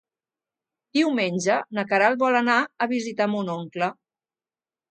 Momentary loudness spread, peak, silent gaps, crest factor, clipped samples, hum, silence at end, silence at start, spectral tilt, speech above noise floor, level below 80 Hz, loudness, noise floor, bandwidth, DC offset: 9 LU; -4 dBFS; none; 20 dB; under 0.1%; none; 1 s; 0.95 s; -4.5 dB/octave; over 67 dB; -74 dBFS; -23 LUFS; under -90 dBFS; 9.2 kHz; under 0.1%